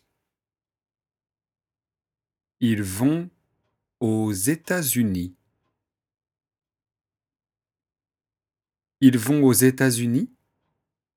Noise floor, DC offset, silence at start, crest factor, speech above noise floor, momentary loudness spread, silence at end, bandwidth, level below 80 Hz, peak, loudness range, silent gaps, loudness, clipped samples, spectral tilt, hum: under -90 dBFS; under 0.1%; 2.6 s; 22 dB; over 70 dB; 11 LU; 0.9 s; 18.5 kHz; -64 dBFS; -4 dBFS; 8 LU; none; -21 LUFS; under 0.1%; -5 dB/octave; none